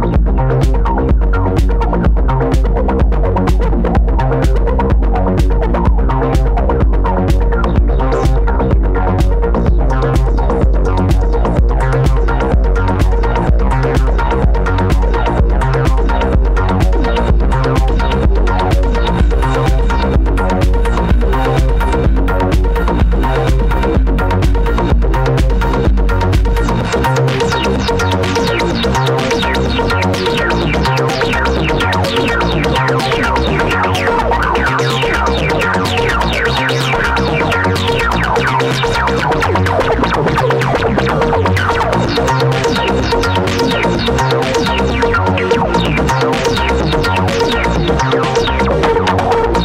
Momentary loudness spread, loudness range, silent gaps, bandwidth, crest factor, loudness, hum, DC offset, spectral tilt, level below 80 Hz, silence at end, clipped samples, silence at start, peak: 1 LU; 1 LU; none; 12 kHz; 10 dB; -13 LUFS; none; under 0.1%; -6 dB/octave; -16 dBFS; 0 s; under 0.1%; 0 s; -2 dBFS